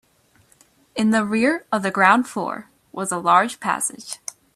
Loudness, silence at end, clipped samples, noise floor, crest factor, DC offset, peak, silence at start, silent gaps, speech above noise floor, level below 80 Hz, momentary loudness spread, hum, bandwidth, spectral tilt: -20 LUFS; 0.4 s; under 0.1%; -58 dBFS; 20 dB; under 0.1%; 0 dBFS; 0.95 s; none; 38 dB; -66 dBFS; 17 LU; none; 14 kHz; -4 dB/octave